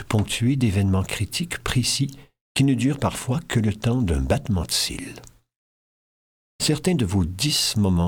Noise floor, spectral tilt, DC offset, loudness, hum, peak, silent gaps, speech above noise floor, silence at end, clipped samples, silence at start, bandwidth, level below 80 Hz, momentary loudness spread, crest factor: under -90 dBFS; -4.5 dB/octave; under 0.1%; -23 LUFS; none; -6 dBFS; 2.41-2.55 s, 5.56-6.59 s; over 68 dB; 0 s; under 0.1%; 0 s; 19 kHz; -38 dBFS; 6 LU; 18 dB